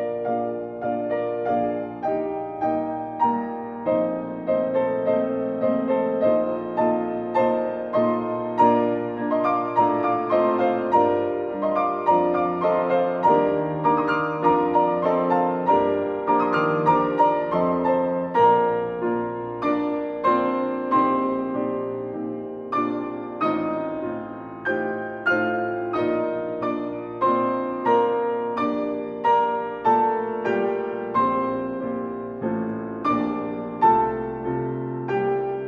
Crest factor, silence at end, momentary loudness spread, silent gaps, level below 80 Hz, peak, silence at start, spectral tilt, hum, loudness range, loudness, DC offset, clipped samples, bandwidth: 18 dB; 0 s; 9 LU; none; -58 dBFS; -6 dBFS; 0 s; -8.5 dB/octave; none; 5 LU; -23 LUFS; under 0.1%; under 0.1%; 6.6 kHz